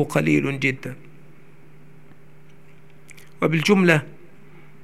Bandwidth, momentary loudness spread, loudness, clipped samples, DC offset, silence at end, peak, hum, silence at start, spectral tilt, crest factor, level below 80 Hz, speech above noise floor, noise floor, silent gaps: 15 kHz; 21 LU; -20 LUFS; under 0.1%; 0.9%; 0.75 s; 0 dBFS; none; 0 s; -6 dB/octave; 24 dB; -64 dBFS; 31 dB; -50 dBFS; none